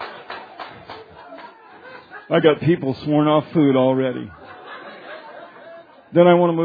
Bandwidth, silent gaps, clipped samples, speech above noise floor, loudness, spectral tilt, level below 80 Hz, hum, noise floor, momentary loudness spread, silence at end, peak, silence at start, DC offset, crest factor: 5 kHz; none; under 0.1%; 26 dB; -17 LUFS; -10 dB/octave; -62 dBFS; none; -42 dBFS; 24 LU; 0 s; 0 dBFS; 0 s; under 0.1%; 20 dB